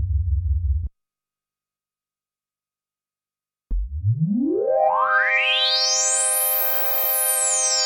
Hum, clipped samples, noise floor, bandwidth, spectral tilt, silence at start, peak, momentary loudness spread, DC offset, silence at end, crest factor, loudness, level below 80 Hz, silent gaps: 50 Hz at -50 dBFS; under 0.1%; under -90 dBFS; 19 kHz; -2.5 dB/octave; 0 s; -8 dBFS; 10 LU; under 0.1%; 0 s; 14 dB; -19 LUFS; -32 dBFS; none